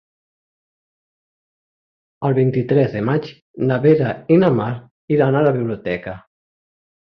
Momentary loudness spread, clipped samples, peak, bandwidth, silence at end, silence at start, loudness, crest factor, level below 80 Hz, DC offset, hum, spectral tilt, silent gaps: 12 LU; under 0.1%; -2 dBFS; 5.8 kHz; 0.85 s; 2.2 s; -18 LUFS; 18 dB; -54 dBFS; under 0.1%; none; -10.5 dB/octave; 3.42-3.54 s, 4.91-5.08 s